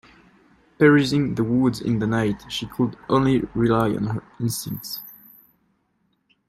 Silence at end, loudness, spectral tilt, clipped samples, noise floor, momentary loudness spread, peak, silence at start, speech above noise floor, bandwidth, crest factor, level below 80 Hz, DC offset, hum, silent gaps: 1.35 s; -22 LUFS; -6 dB/octave; under 0.1%; -69 dBFS; 13 LU; -4 dBFS; 0.8 s; 48 dB; 16 kHz; 18 dB; -50 dBFS; under 0.1%; none; none